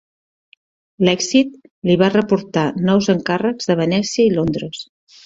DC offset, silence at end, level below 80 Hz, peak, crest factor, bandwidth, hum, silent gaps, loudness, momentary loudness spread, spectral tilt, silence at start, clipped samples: under 0.1%; 0.4 s; -52 dBFS; -2 dBFS; 16 dB; 7.8 kHz; none; 1.71-1.82 s; -17 LUFS; 10 LU; -5.5 dB/octave; 1 s; under 0.1%